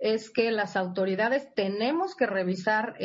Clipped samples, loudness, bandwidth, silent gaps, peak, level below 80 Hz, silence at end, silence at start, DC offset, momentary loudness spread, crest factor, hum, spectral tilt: under 0.1%; -27 LUFS; 8 kHz; none; -12 dBFS; -74 dBFS; 0 s; 0 s; under 0.1%; 2 LU; 16 dB; none; -6 dB/octave